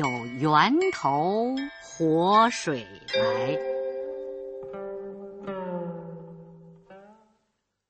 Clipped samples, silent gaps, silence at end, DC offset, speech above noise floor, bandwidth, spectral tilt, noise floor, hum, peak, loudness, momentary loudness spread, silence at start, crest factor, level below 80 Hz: under 0.1%; none; 0.75 s; under 0.1%; 53 dB; 8.4 kHz; -5 dB/octave; -76 dBFS; none; -6 dBFS; -26 LUFS; 19 LU; 0 s; 22 dB; -66 dBFS